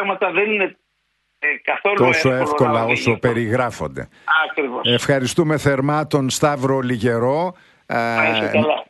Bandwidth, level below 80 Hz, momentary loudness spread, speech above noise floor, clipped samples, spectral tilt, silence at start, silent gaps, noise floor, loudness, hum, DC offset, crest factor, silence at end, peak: 12 kHz; -52 dBFS; 6 LU; 51 dB; under 0.1%; -5 dB/octave; 0 s; none; -69 dBFS; -18 LUFS; none; under 0.1%; 18 dB; 0.05 s; -2 dBFS